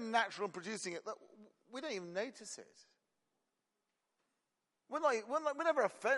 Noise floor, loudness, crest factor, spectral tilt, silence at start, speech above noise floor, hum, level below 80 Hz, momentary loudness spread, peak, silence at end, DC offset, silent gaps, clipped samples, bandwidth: -88 dBFS; -39 LUFS; 22 dB; -3 dB/octave; 0 s; 49 dB; none; under -90 dBFS; 15 LU; -18 dBFS; 0 s; under 0.1%; none; under 0.1%; 11.5 kHz